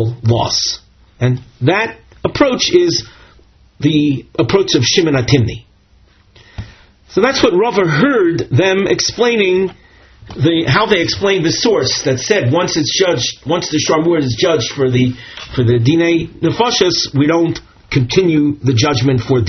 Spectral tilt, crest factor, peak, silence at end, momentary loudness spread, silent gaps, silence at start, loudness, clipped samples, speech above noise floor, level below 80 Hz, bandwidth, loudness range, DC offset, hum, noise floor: -4.5 dB/octave; 14 dB; 0 dBFS; 0 s; 7 LU; none; 0 s; -14 LUFS; under 0.1%; 36 dB; -42 dBFS; 6.6 kHz; 2 LU; under 0.1%; none; -49 dBFS